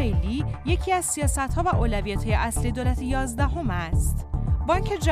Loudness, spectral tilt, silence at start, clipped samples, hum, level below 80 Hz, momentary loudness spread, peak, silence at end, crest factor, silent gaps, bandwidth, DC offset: -25 LUFS; -5.5 dB/octave; 0 s; under 0.1%; none; -28 dBFS; 4 LU; -8 dBFS; 0 s; 16 dB; none; 15.5 kHz; under 0.1%